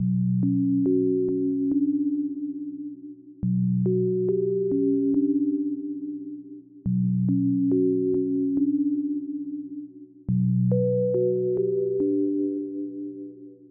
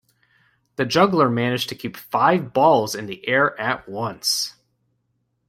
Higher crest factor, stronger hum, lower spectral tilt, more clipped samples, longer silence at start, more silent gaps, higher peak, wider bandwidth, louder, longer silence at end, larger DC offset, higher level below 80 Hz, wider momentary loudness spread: second, 12 dB vs 20 dB; neither; first, -17.5 dB/octave vs -4 dB/octave; neither; second, 0 s vs 0.8 s; neither; second, -12 dBFS vs -2 dBFS; second, 1.1 kHz vs 16.5 kHz; second, -25 LUFS vs -20 LUFS; second, 0.05 s vs 1 s; neither; about the same, -60 dBFS vs -62 dBFS; first, 14 LU vs 11 LU